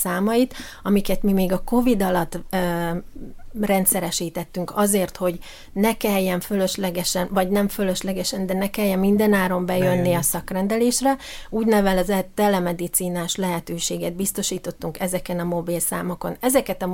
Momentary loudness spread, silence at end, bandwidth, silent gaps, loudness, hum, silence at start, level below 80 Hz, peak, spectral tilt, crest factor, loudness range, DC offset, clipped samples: 9 LU; 0 s; 17 kHz; none; -22 LUFS; none; 0 s; -40 dBFS; -4 dBFS; -4.5 dB/octave; 18 dB; 3 LU; under 0.1%; under 0.1%